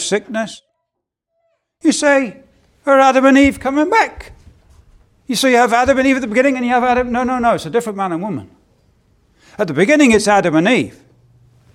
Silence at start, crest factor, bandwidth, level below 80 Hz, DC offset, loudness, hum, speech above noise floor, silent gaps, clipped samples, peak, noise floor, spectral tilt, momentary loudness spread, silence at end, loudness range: 0 s; 16 dB; 15.5 kHz; -44 dBFS; under 0.1%; -14 LUFS; none; 63 dB; none; under 0.1%; 0 dBFS; -77 dBFS; -4.5 dB/octave; 13 LU; 0.85 s; 3 LU